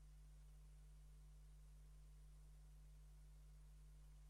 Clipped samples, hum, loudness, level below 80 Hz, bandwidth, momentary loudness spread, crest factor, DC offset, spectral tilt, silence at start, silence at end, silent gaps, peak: under 0.1%; 50 Hz at -65 dBFS; -67 LUFS; -64 dBFS; 12.5 kHz; 0 LU; 6 dB; under 0.1%; -5.5 dB/octave; 0 s; 0 s; none; -58 dBFS